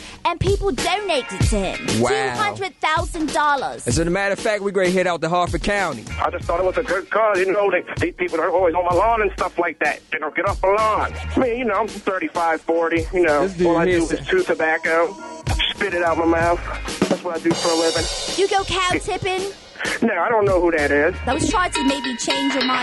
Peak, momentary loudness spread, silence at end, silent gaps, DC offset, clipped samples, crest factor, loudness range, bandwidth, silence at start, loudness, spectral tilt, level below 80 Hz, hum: -8 dBFS; 5 LU; 0 s; none; under 0.1%; under 0.1%; 12 dB; 1 LU; 12 kHz; 0 s; -20 LUFS; -4.5 dB/octave; -36 dBFS; none